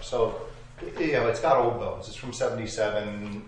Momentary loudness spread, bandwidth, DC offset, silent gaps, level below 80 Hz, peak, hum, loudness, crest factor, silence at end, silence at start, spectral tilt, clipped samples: 16 LU; 10 kHz; under 0.1%; none; -48 dBFS; -8 dBFS; none; -27 LUFS; 20 dB; 0 s; 0 s; -5 dB/octave; under 0.1%